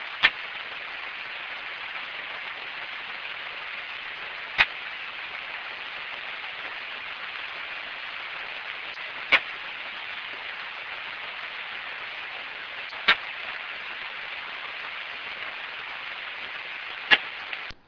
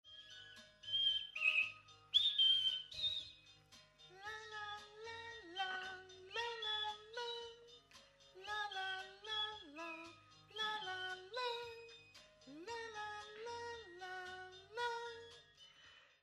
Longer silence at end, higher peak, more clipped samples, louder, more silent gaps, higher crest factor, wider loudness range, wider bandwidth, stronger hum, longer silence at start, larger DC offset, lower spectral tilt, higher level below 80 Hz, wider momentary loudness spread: second, 0.05 s vs 0.2 s; first, 0 dBFS vs -22 dBFS; neither; first, -30 LUFS vs -40 LUFS; neither; first, 32 dB vs 22 dB; second, 4 LU vs 13 LU; second, 5.4 kHz vs 13 kHz; neither; about the same, 0 s vs 0.05 s; neither; about the same, -2 dB/octave vs -1 dB/octave; first, -66 dBFS vs -80 dBFS; second, 11 LU vs 23 LU